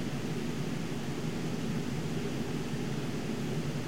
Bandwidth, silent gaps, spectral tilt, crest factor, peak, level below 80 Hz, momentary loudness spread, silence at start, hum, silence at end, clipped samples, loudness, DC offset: 16 kHz; none; -6 dB/octave; 12 dB; -22 dBFS; -54 dBFS; 1 LU; 0 s; none; 0 s; under 0.1%; -35 LUFS; 0.9%